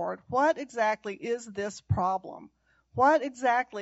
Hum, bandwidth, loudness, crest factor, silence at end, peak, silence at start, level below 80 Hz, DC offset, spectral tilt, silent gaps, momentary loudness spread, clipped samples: none; 8 kHz; -28 LUFS; 18 dB; 0 s; -12 dBFS; 0 s; -56 dBFS; under 0.1%; -4.5 dB/octave; none; 12 LU; under 0.1%